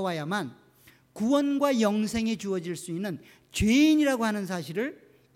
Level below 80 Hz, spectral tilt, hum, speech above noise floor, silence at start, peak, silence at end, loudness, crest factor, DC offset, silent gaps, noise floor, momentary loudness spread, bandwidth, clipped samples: -50 dBFS; -5 dB/octave; none; 32 dB; 0 s; -12 dBFS; 0.4 s; -27 LUFS; 16 dB; under 0.1%; none; -59 dBFS; 13 LU; 16 kHz; under 0.1%